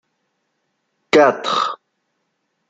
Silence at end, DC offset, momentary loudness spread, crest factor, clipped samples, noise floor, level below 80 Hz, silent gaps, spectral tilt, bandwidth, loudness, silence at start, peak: 0.95 s; under 0.1%; 12 LU; 20 dB; under 0.1%; -71 dBFS; -68 dBFS; none; -3.5 dB/octave; 9 kHz; -16 LUFS; 1.15 s; 0 dBFS